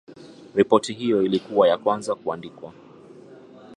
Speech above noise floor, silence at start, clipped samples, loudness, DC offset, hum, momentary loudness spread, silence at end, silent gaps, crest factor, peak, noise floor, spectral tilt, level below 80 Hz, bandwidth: 24 dB; 0.1 s; under 0.1%; -22 LUFS; under 0.1%; none; 18 LU; 0 s; none; 22 dB; -2 dBFS; -46 dBFS; -5.5 dB/octave; -66 dBFS; 11.5 kHz